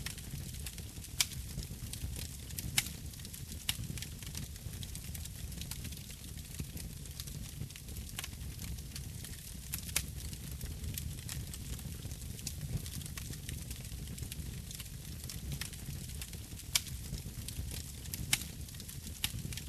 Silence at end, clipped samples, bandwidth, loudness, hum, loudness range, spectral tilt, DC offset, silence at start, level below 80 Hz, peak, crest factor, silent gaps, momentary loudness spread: 0 s; under 0.1%; 15 kHz; -41 LUFS; none; 6 LU; -2.5 dB/octave; under 0.1%; 0 s; -48 dBFS; -12 dBFS; 28 dB; none; 10 LU